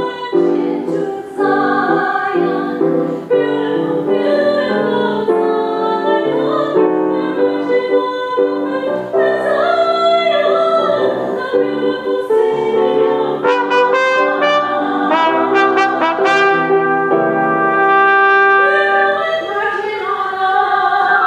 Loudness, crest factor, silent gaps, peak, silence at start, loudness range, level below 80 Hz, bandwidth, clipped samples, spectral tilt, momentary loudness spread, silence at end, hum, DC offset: -14 LUFS; 14 dB; none; 0 dBFS; 0 s; 4 LU; -62 dBFS; 9.8 kHz; under 0.1%; -5.5 dB/octave; 6 LU; 0 s; none; under 0.1%